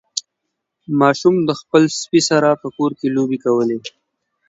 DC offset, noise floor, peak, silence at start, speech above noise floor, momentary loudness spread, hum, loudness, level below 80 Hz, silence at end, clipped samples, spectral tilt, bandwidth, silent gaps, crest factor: under 0.1%; -77 dBFS; 0 dBFS; 0.15 s; 61 dB; 11 LU; none; -17 LUFS; -64 dBFS; 0.6 s; under 0.1%; -5 dB/octave; 8 kHz; none; 18 dB